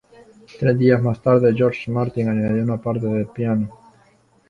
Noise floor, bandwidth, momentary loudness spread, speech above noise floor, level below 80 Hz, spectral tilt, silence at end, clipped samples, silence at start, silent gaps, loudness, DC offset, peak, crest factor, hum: -56 dBFS; 7 kHz; 7 LU; 38 dB; -52 dBFS; -9.5 dB/octave; 0.75 s; under 0.1%; 0.55 s; none; -19 LUFS; under 0.1%; -2 dBFS; 18 dB; none